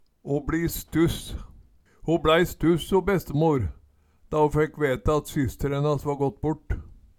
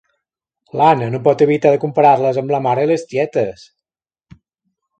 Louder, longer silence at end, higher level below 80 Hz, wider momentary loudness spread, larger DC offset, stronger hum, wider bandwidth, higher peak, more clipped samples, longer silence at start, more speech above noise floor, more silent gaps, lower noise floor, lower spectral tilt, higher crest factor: second, -25 LUFS vs -15 LUFS; second, 0.3 s vs 1.5 s; first, -40 dBFS vs -60 dBFS; first, 13 LU vs 7 LU; neither; neither; first, 18.5 kHz vs 9 kHz; second, -6 dBFS vs 0 dBFS; neither; second, 0.25 s vs 0.75 s; second, 34 dB vs 75 dB; neither; second, -58 dBFS vs -89 dBFS; about the same, -6.5 dB/octave vs -7.5 dB/octave; about the same, 18 dB vs 16 dB